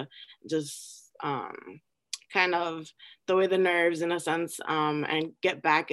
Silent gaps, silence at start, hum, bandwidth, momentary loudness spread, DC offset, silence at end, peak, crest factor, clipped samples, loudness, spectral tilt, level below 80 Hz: none; 0 s; none; 12.5 kHz; 17 LU; under 0.1%; 0 s; -8 dBFS; 20 dB; under 0.1%; -28 LUFS; -4 dB/octave; -80 dBFS